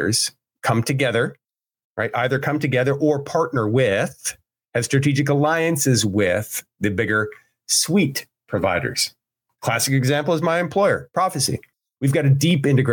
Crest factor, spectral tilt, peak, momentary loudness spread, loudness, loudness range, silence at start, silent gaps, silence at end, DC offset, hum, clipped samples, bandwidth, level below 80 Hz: 14 dB; -4.5 dB/octave; -6 dBFS; 9 LU; -20 LUFS; 2 LU; 0 s; 1.84-1.96 s; 0 s; under 0.1%; none; under 0.1%; 18 kHz; -58 dBFS